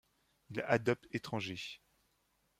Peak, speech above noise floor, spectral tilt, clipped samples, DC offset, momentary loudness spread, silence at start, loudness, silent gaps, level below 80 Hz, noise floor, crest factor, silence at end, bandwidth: -14 dBFS; 41 dB; -5.5 dB/octave; under 0.1%; under 0.1%; 13 LU; 0.5 s; -38 LUFS; none; -74 dBFS; -77 dBFS; 26 dB; 0.85 s; 15.5 kHz